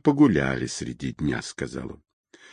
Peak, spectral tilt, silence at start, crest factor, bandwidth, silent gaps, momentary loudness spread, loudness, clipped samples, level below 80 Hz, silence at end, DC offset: -8 dBFS; -6 dB/octave; 0.05 s; 18 dB; 10.5 kHz; none; 15 LU; -25 LUFS; under 0.1%; -48 dBFS; 0.6 s; under 0.1%